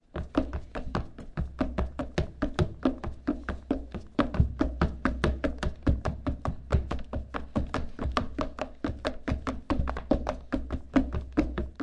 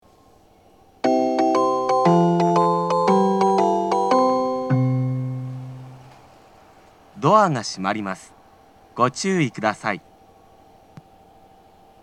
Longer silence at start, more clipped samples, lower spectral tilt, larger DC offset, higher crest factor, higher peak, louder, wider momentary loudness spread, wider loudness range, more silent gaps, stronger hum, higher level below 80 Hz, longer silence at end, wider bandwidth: second, 0.15 s vs 1.05 s; neither; about the same, -7.5 dB/octave vs -6.5 dB/octave; neither; about the same, 20 dB vs 20 dB; second, -10 dBFS vs -2 dBFS; second, -32 LUFS vs -20 LUFS; second, 7 LU vs 14 LU; second, 3 LU vs 8 LU; neither; neither; first, -36 dBFS vs -64 dBFS; second, 0 s vs 2.05 s; second, 10 kHz vs 11.5 kHz